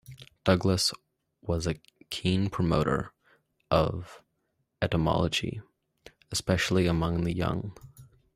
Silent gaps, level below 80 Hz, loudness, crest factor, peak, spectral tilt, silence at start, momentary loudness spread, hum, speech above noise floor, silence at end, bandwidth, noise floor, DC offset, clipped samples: none; -48 dBFS; -28 LUFS; 22 dB; -8 dBFS; -5.5 dB/octave; 0.1 s; 16 LU; none; 50 dB; 0.3 s; 15.5 kHz; -77 dBFS; under 0.1%; under 0.1%